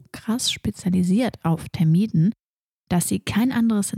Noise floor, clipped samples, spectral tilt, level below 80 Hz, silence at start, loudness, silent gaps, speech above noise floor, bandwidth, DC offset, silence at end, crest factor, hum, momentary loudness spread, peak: -81 dBFS; under 0.1%; -5.5 dB/octave; -50 dBFS; 0.15 s; -22 LUFS; 2.43-2.84 s; 60 dB; 16 kHz; under 0.1%; 0 s; 12 dB; none; 6 LU; -10 dBFS